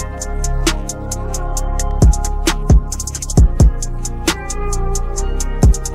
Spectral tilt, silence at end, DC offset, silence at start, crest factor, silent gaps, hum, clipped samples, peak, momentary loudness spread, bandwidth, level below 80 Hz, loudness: -5 dB/octave; 0 s; under 0.1%; 0 s; 12 dB; none; none; under 0.1%; -2 dBFS; 9 LU; 15 kHz; -16 dBFS; -18 LUFS